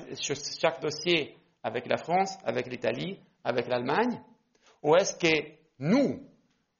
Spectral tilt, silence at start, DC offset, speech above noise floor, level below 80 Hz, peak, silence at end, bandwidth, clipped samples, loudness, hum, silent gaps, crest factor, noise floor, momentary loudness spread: -3.5 dB/octave; 0 s; under 0.1%; 36 dB; -70 dBFS; -10 dBFS; 0.55 s; 7.2 kHz; under 0.1%; -29 LUFS; none; none; 20 dB; -64 dBFS; 12 LU